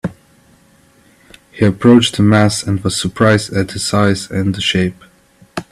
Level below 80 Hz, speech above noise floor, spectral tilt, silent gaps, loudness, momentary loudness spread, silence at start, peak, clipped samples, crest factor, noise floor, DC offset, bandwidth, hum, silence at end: -46 dBFS; 37 dB; -5 dB/octave; none; -14 LUFS; 10 LU; 0.05 s; 0 dBFS; under 0.1%; 16 dB; -50 dBFS; under 0.1%; 13.5 kHz; none; 0.1 s